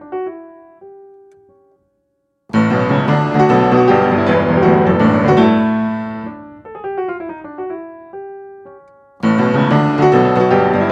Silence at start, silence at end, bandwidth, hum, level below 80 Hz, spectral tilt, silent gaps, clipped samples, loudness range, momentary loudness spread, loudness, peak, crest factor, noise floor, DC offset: 0 s; 0 s; 7.6 kHz; none; -48 dBFS; -8.5 dB/octave; none; under 0.1%; 11 LU; 20 LU; -14 LUFS; 0 dBFS; 14 dB; -66 dBFS; under 0.1%